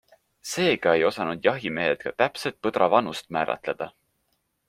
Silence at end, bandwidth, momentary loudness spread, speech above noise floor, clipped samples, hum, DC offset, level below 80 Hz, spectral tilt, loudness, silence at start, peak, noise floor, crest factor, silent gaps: 0.8 s; 16 kHz; 11 LU; 49 dB; under 0.1%; none; under 0.1%; -64 dBFS; -4.5 dB/octave; -25 LUFS; 0.45 s; -4 dBFS; -73 dBFS; 22 dB; none